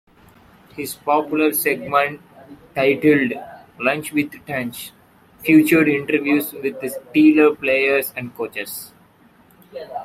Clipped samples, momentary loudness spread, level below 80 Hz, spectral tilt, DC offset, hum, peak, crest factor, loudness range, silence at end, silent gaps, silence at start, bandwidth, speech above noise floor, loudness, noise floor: under 0.1%; 18 LU; -62 dBFS; -5 dB/octave; under 0.1%; none; -2 dBFS; 18 dB; 4 LU; 0 s; none; 0.75 s; 16 kHz; 34 dB; -18 LUFS; -52 dBFS